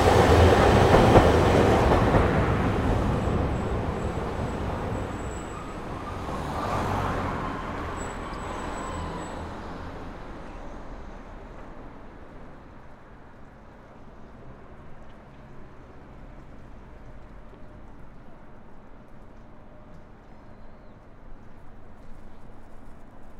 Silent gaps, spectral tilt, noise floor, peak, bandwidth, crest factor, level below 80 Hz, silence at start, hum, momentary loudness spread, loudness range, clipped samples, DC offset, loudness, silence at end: none; -6.5 dB/octave; -47 dBFS; -2 dBFS; 16 kHz; 24 dB; -36 dBFS; 0 s; none; 30 LU; 28 LU; under 0.1%; under 0.1%; -24 LUFS; 0 s